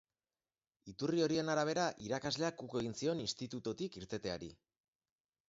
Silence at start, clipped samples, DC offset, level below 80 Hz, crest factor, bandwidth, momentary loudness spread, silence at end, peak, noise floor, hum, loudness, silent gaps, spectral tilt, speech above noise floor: 0.85 s; under 0.1%; under 0.1%; -70 dBFS; 20 dB; 7.6 kHz; 10 LU; 0.95 s; -20 dBFS; under -90 dBFS; none; -38 LUFS; none; -4 dB/octave; over 52 dB